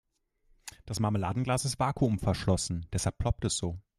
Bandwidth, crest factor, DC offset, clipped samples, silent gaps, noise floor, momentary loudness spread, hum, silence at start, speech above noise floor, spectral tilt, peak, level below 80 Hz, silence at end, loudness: 14 kHz; 18 dB; under 0.1%; under 0.1%; none; -68 dBFS; 9 LU; none; 0.65 s; 38 dB; -5 dB/octave; -14 dBFS; -46 dBFS; 0.2 s; -31 LUFS